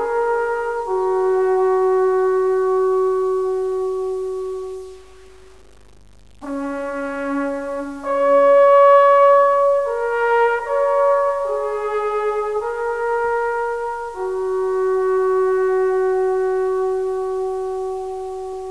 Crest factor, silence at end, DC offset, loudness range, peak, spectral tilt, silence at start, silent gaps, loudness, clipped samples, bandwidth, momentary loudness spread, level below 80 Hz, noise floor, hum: 16 dB; 0 s; 0.5%; 13 LU; -2 dBFS; -5 dB/octave; 0 s; none; -18 LUFS; under 0.1%; 11 kHz; 14 LU; -52 dBFS; -46 dBFS; none